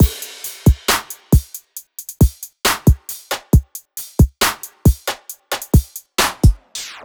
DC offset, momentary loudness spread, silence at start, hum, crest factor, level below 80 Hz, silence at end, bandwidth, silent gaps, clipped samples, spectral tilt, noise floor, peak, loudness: under 0.1%; 15 LU; 0 s; none; 16 dB; -22 dBFS; 0.15 s; over 20 kHz; none; under 0.1%; -4.5 dB/octave; -37 dBFS; 0 dBFS; -18 LUFS